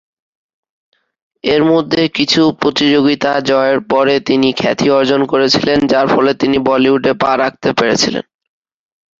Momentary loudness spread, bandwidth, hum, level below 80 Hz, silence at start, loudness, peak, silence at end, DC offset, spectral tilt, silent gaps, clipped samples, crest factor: 3 LU; 7.6 kHz; none; -48 dBFS; 1.45 s; -12 LUFS; 0 dBFS; 1 s; under 0.1%; -4.5 dB/octave; none; under 0.1%; 14 dB